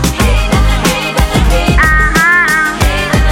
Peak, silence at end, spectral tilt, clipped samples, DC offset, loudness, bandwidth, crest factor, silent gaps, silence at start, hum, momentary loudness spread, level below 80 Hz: 0 dBFS; 0 s; -4.5 dB/octave; under 0.1%; under 0.1%; -10 LUFS; 16.5 kHz; 10 dB; none; 0 s; none; 5 LU; -14 dBFS